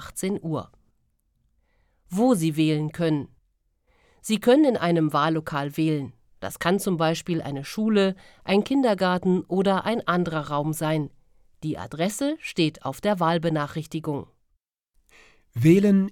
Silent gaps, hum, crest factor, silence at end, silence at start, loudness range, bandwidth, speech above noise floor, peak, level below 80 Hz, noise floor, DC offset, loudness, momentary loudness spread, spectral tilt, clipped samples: none; none; 20 dB; 0 s; 0 s; 4 LU; 17 kHz; 50 dB; -6 dBFS; -60 dBFS; -73 dBFS; under 0.1%; -24 LUFS; 13 LU; -6 dB/octave; under 0.1%